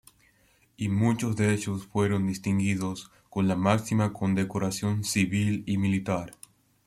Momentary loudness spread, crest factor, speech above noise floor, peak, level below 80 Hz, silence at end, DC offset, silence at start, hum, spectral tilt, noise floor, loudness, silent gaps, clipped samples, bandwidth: 7 LU; 18 dB; 38 dB; -10 dBFS; -60 dBFS; 0.55 s; under 0.1%; 0.8 s; none; -6 dB/octave; -64 dBFS; -27 LUFS; none; under 0.1%; 14.5 kHz